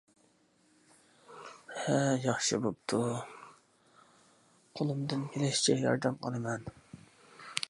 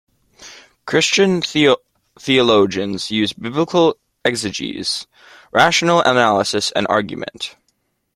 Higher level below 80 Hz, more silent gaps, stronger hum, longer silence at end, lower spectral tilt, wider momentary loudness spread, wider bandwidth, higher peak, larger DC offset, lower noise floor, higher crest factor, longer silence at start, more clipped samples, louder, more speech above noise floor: second, -70 dBFS vs -56 dBFS; neither; neither; second, 0.05 s vs 0.65 s; about the same, -4.5 dB/octave vs -3.5 dB/octave; first, 22 LU vs 12 LU; second, 11.5 kHz vs 15 kHz; second, -8 dBFS vs 0 dBFS; neither; about the same, -68 dBFS vs -67 dBFS; first, 26 dB vs 18 dB; first, 1.3 s vs 0.4 s; neither; second, -32 LUFS vs -16 LUFS; second, 37 dB vs 51 dB